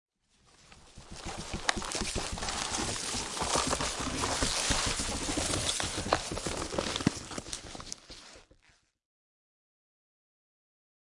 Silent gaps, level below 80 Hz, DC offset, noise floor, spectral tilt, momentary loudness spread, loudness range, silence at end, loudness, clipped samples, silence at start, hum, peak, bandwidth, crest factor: none; -46 dBFS; under 0.1%; -67 dBFS; -2.5 dB/octave; 14 LU; 15 LU; 2.7 s; -32 LUFS; under 0.1%; 0.65 s; none; -8 dBFS; 11.5 kHz; 28 dB